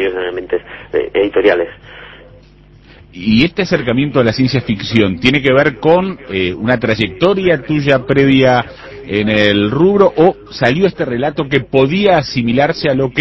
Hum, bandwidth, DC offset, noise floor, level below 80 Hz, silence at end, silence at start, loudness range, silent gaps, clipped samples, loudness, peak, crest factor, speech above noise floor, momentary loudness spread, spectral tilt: none; 8 kHz; under 0.1%; -42 dBFS; -40 dBFS; 0 s; 0 s; 4 LU; none; 0.1%; -13 LUFS; 0 dBFS; 14 dB; 29 dB; 9 LU; -7 dB/octave